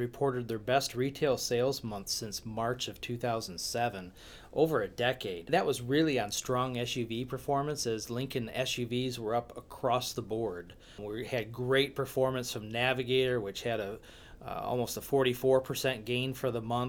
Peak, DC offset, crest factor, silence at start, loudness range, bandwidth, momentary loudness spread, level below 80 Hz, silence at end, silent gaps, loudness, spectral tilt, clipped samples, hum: -14 dBFS; under 0.1%; 20 dB; 0 s; 3 LU; over 20 kHz; 9 LU; -58 dBFS; 0 s; none; -32 LUFS; -4.5 dB/octave; under 0.1%; none